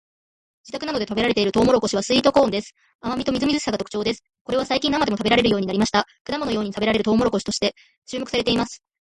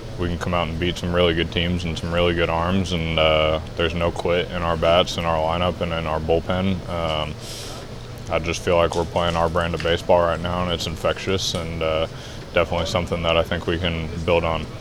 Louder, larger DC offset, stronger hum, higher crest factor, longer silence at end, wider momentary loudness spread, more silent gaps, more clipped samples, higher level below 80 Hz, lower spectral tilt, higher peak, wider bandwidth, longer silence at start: about the same, -21 LUFS vs -22 LUFS; neither; neither; about the same, 18 dB vs 18 dB; first, 0.25 s vs 0 s; first, 11 LU vs 7 LU; first, 2.95-2.99 s, 4.41-4.45 s, 6.21-6.25 s, 7.98-8.02 s vs none; neither; second, -48 dBFS vs -36 dBFS; about the same, -4.5 dB/octave vs -5 dB/octave; about the same, -4 dBFS vs -4 dBFS; second, 11.5 kHz vs 13.5 kHz; first, 0.65 s vs 0 s